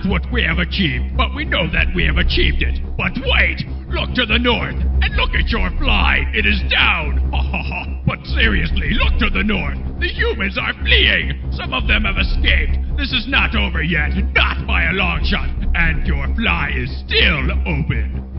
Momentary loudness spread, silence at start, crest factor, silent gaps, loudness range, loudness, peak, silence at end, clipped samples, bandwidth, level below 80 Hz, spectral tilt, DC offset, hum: 7 LU; 0 s; 16 dB; none; 2 LU; -17 LUFS; 0 dBFS; 0 s; under 0.1%; 5.8 kHz; -20 dBFS; -8.5 dB/octave; under 0.1%; none